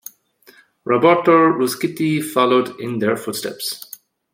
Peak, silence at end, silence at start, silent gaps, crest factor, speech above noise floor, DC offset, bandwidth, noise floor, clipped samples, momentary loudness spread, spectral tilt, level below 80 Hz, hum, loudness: -2 dBFS; 0.55 s; 0.85 s; none; 16 dB; 34 dB; under 0.1%; 16.5 kHz; -51 dBFS; under 0.1%; 16 LU; -5 dB/octave; -66 dBFS; none; -17 LUFS